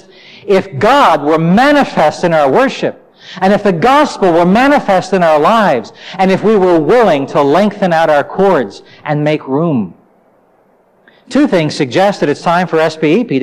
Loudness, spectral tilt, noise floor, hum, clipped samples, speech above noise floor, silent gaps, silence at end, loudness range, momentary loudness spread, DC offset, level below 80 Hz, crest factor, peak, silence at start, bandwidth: -11 LUFS; -6.5 dB/octave; -51 dBFS; none; under 0.1%; 40 dB; none; 0 s; 5 LU; 7 LU; under 0.1%; -46 dBFS; 10 dB; -2 dBFS; 0.45 s; 15 kHz